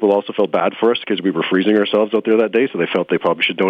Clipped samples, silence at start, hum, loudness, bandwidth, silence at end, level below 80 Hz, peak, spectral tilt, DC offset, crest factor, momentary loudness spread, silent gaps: under 0.1%; 0 s; none; -17 LUFS; 5 kHz; 0 s; -66 dBFS; -4 dBFS; -7.5 dB/octave; under 0.1%; 12 dB; 4 LU; none